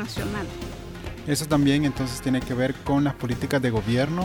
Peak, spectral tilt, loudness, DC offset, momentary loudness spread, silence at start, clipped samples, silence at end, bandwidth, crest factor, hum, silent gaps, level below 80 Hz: -10 dBFS; -6 dB/octave; -25 LUFS; under 0.1%; 14 LU; 0 s; under 0.1%; 0 s; 19.5 kHz; 16 dB; none; none; -42 dBFS